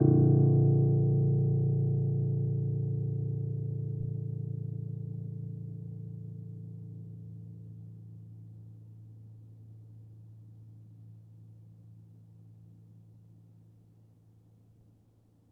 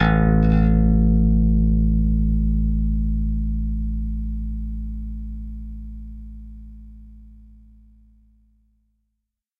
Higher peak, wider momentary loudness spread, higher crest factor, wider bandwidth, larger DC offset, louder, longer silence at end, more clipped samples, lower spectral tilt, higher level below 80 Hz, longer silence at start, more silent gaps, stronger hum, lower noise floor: second, -12 dBFS vs -6 dBFS; first, 27 LU vs 21 LU; first, 22 dB vs 16 dB; second, 1.2 kHz vs 3.7 kHz; neither; second, -30 LUFS vs -21 LUFS; first, 2.95 s vs 2.25 s; neither; first, -14.5 dB/octave vs -10.5 dB/octave; second, -62 dBFS vs -24 dBFS; about the same, 0 s vs 0 s; neither; neither; second, -64 dBFS vs -79 dBFS